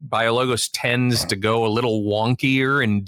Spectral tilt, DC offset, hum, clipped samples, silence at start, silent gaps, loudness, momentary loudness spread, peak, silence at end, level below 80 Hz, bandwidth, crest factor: -4.5 dB/octave; under 0.1%; none; under 0.1%; 0 s; none; -20 LUFS; 3 LU; -6 dBFS; 0 s; -54 dBFS; 17.5 kHz; 14 dB